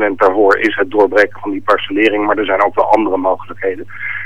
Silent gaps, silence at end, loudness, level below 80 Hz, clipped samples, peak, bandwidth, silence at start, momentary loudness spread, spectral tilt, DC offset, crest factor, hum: none; 0 s; -14 LUFS; -54 dBFS; under 0.1%; 0 dBFS; 10.5 kHz; 0 s; 10 LU; -5.5 dB/octave; 3%; 14 dB; none